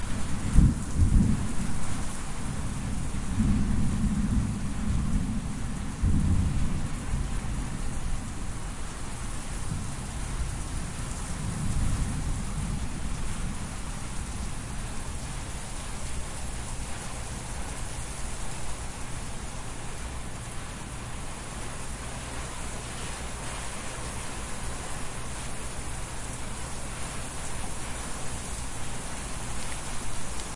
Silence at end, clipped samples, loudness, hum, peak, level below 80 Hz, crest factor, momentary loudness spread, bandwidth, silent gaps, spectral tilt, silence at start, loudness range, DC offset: 0 s; under 0.1%; -33 LUFS; none; -4 dBFS; -34 dBFS; 26 dB; 10 LU; 11.5 kHz; none; -5 dB/octave; 0 s; 7 LU; under 0.1%